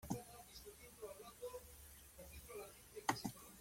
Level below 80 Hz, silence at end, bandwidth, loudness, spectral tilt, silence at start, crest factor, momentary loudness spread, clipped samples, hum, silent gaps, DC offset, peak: -68 dBFS; 0 s; 16.5 kHz; -51 LUFS; -4 dB/octave; 0 s; 30 dB; 15 LU; under 0.1%; none; none; under 0.1%; -22 dBFS